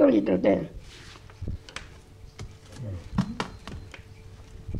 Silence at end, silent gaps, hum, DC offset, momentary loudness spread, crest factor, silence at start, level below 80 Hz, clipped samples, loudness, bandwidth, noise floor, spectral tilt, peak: 0 s; none; none; under 0.1%; 25 LU; 20 dB; 0 s; -46 dBFS; under 0.1%; -28 LUFS; 11.5 kHz; -47 dBFS; -7.5 dB/octave; -8 dBFS